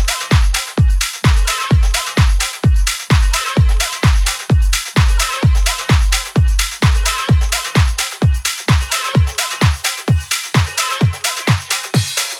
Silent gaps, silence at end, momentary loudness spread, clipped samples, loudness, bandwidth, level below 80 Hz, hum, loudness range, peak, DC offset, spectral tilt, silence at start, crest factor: none; 0 s; 2 LU; under 0.1%; -15 LUFS; 17.5 kHz; -18 dBFS; none; 1 LU; 0 dBFS; under 0.1%; -4 dB/octave; 0 s; 14 dB